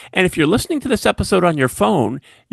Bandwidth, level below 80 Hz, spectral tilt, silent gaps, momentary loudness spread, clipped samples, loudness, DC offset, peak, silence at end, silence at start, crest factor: 12.5 kHz; -38 dBFS; -5 dB/octave; none; 4 LU; under 0.1%; -17 LUFS; under 0.1%; 0 dBFS; 0.35 s; 0 s; 16 dB